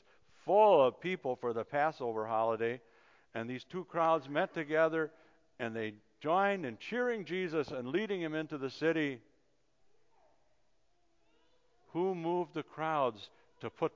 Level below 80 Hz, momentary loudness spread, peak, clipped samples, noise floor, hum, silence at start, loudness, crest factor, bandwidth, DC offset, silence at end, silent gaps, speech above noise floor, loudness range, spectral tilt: -80 dBFS; 12 LU; -14 dBFS; under 0.1%; -77 dBFS; none; 0.45 s; -34 LUFS; 20 dB; 7.6 kHz; under 0.1%; 0.05 s; none; 44 dB; 9 LU; -6.5 dB/octave